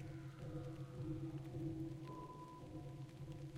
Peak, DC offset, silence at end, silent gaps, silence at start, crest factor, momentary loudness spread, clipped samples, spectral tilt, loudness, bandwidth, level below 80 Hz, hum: -34 dBFS; under 0.1%; 0 s; none; 0 s; 14 dB; 6 LU; under 0.1%; -8 dB/octave; -50 LUFS; 14 kHz; -64 dBFS; none